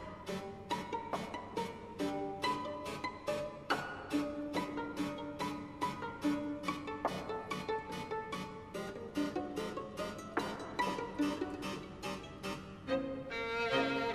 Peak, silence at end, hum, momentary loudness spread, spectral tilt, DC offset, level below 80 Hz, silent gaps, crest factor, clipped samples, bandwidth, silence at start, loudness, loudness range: -18 dBFS; 0 s; none; 7 LU; -5 dB/octave; under 0.1%; -62 dBFS; none; 22 dB; under 0.1%; 14 kHz; 0 s; -39 LUFS; 2 LU